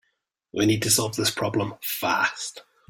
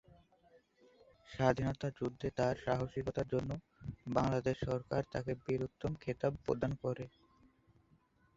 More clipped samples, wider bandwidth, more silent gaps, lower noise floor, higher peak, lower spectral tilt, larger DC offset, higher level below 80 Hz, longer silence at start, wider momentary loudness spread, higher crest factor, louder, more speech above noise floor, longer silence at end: neither; first, 17 kHz vs 7.8 kHz; neither; first, -75 dBFS vs -71 dBFS; first, -6 dBFS vs -16 dBFS; second, -3 dB/octave vs -6.5 dB/octave; neither; about the same, -60 dBFS vs -58 dBFS; second, 0.55 s vs 1.3 s; about the same, 12 LU vs 10 LU; about the same, 20 dB vs 24 dB; first, -23 LUFS vs -38 LUFS; first, 50 dB vs 34 dB; second, 0.3 s vs 1.3 s